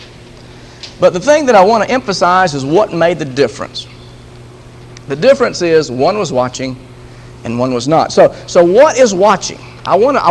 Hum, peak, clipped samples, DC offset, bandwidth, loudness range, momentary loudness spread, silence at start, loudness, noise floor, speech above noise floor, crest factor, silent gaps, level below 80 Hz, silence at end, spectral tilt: none; 0 dBFS; 0.3%; under 0.1%; 11 kHz; 4 LU; 16 LU; 0 s; -11 LUFS; -35 dBFS; 24 dB; 12 dB; none; -44 dBFS; 0 s; -4.5 dB/octave